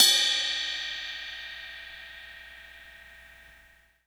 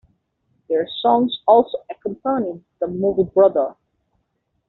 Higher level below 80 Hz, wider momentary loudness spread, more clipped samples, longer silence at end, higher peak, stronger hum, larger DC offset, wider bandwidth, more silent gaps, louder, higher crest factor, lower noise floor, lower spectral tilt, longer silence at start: about the same, -62 dBFS vs -58 dBFS; first, 25 LU vs 12 LU; neither; second, 0.65 s vs 0.95 s; about the same, -4 dBFS vs -2 dBFS; first, 60 Hz at -65 dBFS vs none; neither; first, over 20 kHz vs 4.2 kHz; neither; second, -27 LUFS vs -19 LUFS; first, 26 dB vs 18 dB; second, -59 dBFS vs -71 dBFS; second, 2.5 dB/octave vs -5 dB/octave; second, 0 s vs 0.7 s